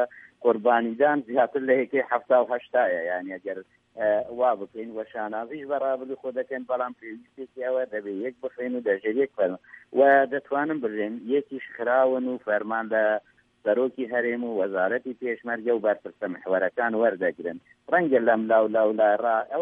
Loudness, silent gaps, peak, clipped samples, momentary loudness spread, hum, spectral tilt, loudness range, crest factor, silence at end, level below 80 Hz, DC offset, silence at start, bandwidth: -25 LUFS; none; -6 dBFS; under 0.1%; 12 LU; none; -8.5 dB/octave; 6 LU; 18 dB; 0 s; -76 dBFS; under 0.1%; 0 s; 3.8 kHz